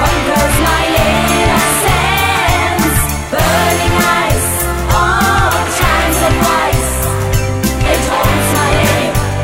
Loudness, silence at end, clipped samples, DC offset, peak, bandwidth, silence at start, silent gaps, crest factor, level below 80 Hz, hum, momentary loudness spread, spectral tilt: -12 LUFS; 0 s; under 0.1%; under 0.1%; 0 dBFS; 16.5 kHz; 0 s; none; 12 dB; -20 dBFS; none; 4 LU; -4 dB/octave